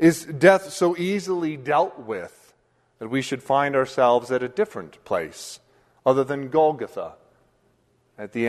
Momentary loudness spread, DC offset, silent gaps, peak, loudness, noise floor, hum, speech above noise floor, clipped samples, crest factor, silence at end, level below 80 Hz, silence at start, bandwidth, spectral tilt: 19 LU; under 0.1%; none; -2 dBFS; -23 LUFS; -64 dBFS; none; 42 dB; under 0.1%; 22 dB; 0 s; -66 dBFS; 0 s; 13.5 kHz; -5.5 dB/octave